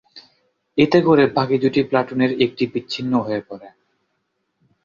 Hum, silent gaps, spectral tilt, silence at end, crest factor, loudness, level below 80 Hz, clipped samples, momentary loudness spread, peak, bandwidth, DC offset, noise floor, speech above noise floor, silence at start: none; none; -7 dB/octave; 1.15 s; 18 dB; -19 LUFS; -56 dBFS; under 0.1%; 12 LU; -2 dBFS; 7.2 kHz; under 0.1%; -72 dBFS; 54 dB; 0.15 s